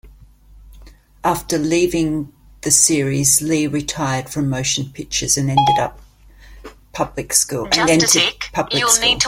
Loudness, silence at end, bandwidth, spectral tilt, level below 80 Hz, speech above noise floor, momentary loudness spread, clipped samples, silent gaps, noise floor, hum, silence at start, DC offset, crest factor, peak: -16 LUFS; 0 s; 16.5 kHz; -2.5 dB/octave; -42 dBFS; 27 dB; 12 LU; under 0.1%; none; -45 dBFS; none; 0.05 s; under 0.1%; 18 dB; 0 dBFS